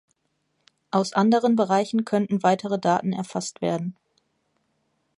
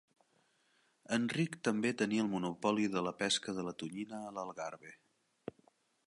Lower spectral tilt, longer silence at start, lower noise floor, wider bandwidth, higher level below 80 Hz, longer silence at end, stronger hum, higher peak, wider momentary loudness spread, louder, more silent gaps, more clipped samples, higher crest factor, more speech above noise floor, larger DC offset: first, -6 dB/octave vs -4.5 dB/octave; second, 0.95 s vs 1.1 s; about the same, -73 dBFS vs -74 dBFS; about the same, 11.5 kHz vs 11.5 kHz; first, -70 dBFS vs -78 dBFS; first, 1.25 s vs 0.55 s; neither; first, -6 dBFS vs -18 dBFS; second, 9 LU vs 18 LU; first, -23 LUFS vs -36 LUFS; neither; neither; about the same, 18 dB vs 20 dB; first, 51 dB vs 38 dB; neither